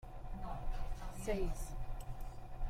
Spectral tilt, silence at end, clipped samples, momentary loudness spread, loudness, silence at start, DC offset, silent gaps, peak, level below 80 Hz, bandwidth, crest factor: -6 dB/octave; 0 s; under 0.1%; 11 LU; -46 LUFS; 0.05 s; under 0.1%; none; -24 dBFS; -42 dBFS; 15.5 kHz; 14 dB